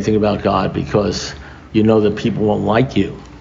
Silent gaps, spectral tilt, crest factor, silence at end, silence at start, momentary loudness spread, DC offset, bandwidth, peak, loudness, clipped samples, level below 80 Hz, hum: none; -6.5 dB/octave; 14 dB; 0 s; 0 s; 10 LU; under 0.1%; 7.6 kHz; -2 dBFS; -17 LUFS; under 0.1%; -38 dBFS; none